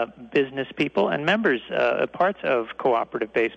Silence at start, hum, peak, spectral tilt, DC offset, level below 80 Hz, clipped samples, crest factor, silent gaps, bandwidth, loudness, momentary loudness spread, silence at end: 0 s; none; -8 dBFS; -6.5 dB/octave; under 0.1%; -64 dBFS; under 0.1%; 14 dB; none; 8.2 kHz; -23 LUFS; 4 LU; 0 s